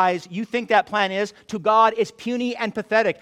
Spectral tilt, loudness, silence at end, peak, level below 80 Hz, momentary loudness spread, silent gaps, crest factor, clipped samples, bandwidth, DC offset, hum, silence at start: -4.5 dB/octave; -21 LUFS; 0.1 s; -4 dBFS; -66 dBFS; 10 LU; none; 18 dB; under 0.1%; 12.5 kHz; under 0.1%; none; 0 s